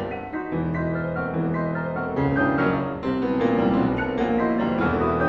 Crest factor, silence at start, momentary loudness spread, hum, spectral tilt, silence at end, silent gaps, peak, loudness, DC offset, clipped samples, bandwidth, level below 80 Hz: 16 dB; 0 s; 6 LU; none; -9.5 dB/octave; 0 s; none; -8 dBFS; -24 LUFS; under 0.1%; under 0.1%; 6.8 kHz; -44 dBFS